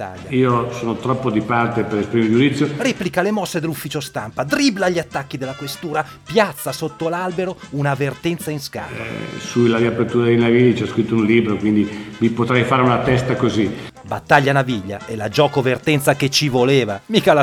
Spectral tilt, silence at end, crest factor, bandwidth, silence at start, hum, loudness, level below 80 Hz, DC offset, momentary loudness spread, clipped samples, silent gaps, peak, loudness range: -5.5 dB/octave; 0 s; 18 dB; 19 kHz; 0 s; none; -18 LUFS; -50 dBFS; under 0.1%; 11 LU; under 0.1%; none; 0 dBFS; 5 LU